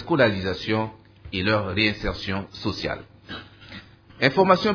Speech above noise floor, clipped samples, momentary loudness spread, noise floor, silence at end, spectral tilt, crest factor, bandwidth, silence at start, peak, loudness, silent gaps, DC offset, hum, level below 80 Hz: 22 dB; under 0.1%; 19 LU; -44 dBFS; 0 s; -6.5 dB/octave; 22 dB; 5.4 kHz; 0 s; -2 dBFS; -24 LUFS; none; under 0.1%; none; -46 dBFS